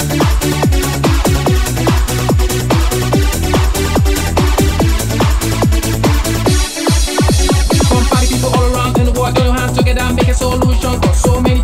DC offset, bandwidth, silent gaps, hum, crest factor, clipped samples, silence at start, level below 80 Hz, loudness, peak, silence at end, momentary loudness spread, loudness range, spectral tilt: under 0.1%; 16.5 kHz; none; none; 10 dB; under 0.1%; 0 s; -16 dBFS; -13 LUFS; 0 dBFS; 0 s; 2 LU; 1 LU; -5 dB/octave